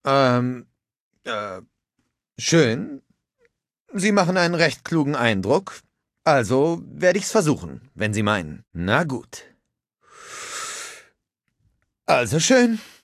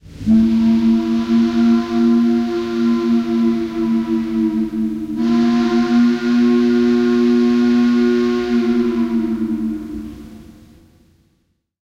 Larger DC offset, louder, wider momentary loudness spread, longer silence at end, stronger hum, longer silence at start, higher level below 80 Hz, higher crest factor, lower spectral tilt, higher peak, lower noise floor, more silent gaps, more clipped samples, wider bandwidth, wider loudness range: neither; second, -21 LUFS vs -16 LUFS; first, 18 LU vs 7 LU; second, 0.15 s vs 1.4 s; neither; about the same, 0.05 s vs 0.05 s; second, -52 dBFS vs -44 dBFS; first, 20 dB vs 12 dB; second, -4.5 dB/octave vs -7 dB/octave; about the same, -2 dBFS vs -4 dBFS; first, -75 dBFS vs -64 dBFS; first, 1.00-1.11 s, 3.80-3.85 s vs none; neither; first, 14.5 kHz vs 7.2 kHz; about the same, 7 LU vs 5 LU